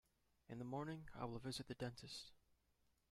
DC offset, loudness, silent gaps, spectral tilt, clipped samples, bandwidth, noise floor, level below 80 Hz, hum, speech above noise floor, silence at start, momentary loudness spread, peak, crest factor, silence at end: under 0.1%; -51 LUFS; none; -5 dB/octave; under 0.1%; 14.5 kHz; -82 dBFS; -72 dBFS; none; 32 dB; 0.5 s; 6 LU; -32 dBFS; 20 dB; 0.7 s